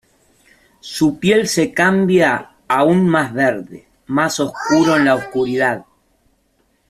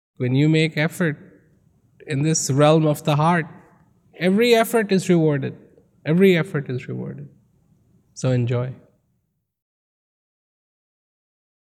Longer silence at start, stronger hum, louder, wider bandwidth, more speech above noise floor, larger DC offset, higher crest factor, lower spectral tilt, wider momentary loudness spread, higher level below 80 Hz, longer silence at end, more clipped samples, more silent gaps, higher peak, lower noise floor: first, 0.85 s vs 0.2 s; neither; first, -16 LUFS vs -20 LUFS; second, 14.5 kHz vs 16.5 kHz; second, 46 dB vs 53 dB; neither; about the same, 16 dB vs 20 dB; about the same, -5 dB/octave vs -6 dB/octave; second, 9 LU vs 15 LU; first, -54 dBFS vs -64 dBFS; second, 1.05 s vs 2.9 s; neither; neither; about the same, -2 dBFS vs -2 dBFS; second, -61 dBFS vs -72 dBFS